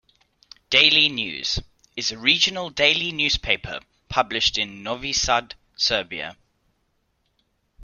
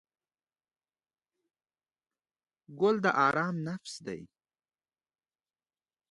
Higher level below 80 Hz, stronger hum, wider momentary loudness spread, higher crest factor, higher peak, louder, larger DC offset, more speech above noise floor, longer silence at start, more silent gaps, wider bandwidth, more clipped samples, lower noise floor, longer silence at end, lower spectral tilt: first, -46 dBFS vs -78 dBFS; neither; about the same, 16 LU vs 16 LU; about the same, 24 dB vs 24 dB; first, 0 dBFS vs -12 dBFS; first, -20 LUFS vs -29 LUFS; neither; second, 48 dB vs over 60 dB; second, 0.7 s vs 2.7 s; neither; first, 14 kHz vs 11 kHz; neither; second, -70 dBFS vs under -90 dBFS; second, 0 s vs 1.85 s; second, -1.5 dB/octave vs -6 dB/octave